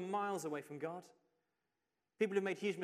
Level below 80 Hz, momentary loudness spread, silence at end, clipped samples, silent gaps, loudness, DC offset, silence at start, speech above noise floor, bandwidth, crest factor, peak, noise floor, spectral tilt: under -90 dBFS; 9 LU; 0 s; under 0.1%; none; -40 LUFS; under 0.1%; 0 s; 49 dB; 15 kHz; 20 dB; -22 dBFS; -89 dBFS; -5 dB/octave